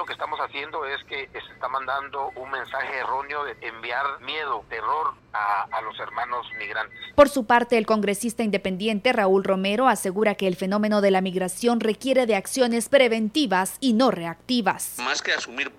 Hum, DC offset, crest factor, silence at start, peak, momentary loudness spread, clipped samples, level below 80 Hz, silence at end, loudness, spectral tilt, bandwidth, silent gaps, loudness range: none; under 0.1%; 20 dB; 0 s; -4 dBFS; 11 LU; under 0.1%; -58 dBFS; 0.05 s; -24 LUFS; -4 dB/octave; 16.5 kHz; none; 7 LU